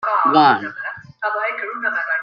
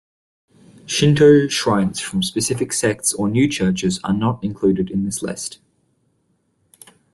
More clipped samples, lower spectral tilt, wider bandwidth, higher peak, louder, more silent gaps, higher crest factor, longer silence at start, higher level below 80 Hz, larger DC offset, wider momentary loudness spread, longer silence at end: neither; first, -6.5 dB/octave vs -5 dB/octave; second, 6.4 kHz vs 12.5 kHz; about the same, -2 dBFS vs -2 dBFS; about the same, -18 LUFS vs -18 LUFS; neither; about the same, 18 dB vs 18 dB; second, 0 s vs 0.85 s; second, -68 dBFS vs -52 dBFS; neither; first, 15 LU vs 11 LU; second, 0 s vs 1.6 s